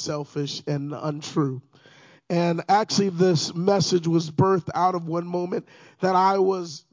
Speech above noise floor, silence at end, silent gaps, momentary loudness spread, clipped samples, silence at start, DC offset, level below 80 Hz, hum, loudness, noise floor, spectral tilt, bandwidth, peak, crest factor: 30 dB; 0.15 s; none; 9 LU; under 0.1%; 0 s; under 0.1%; -66 dBFS; none; -23 LUFS; -53 dBFS; -5.5 dB/octave; 7.6 kHz; -6 dBFS; 18 dB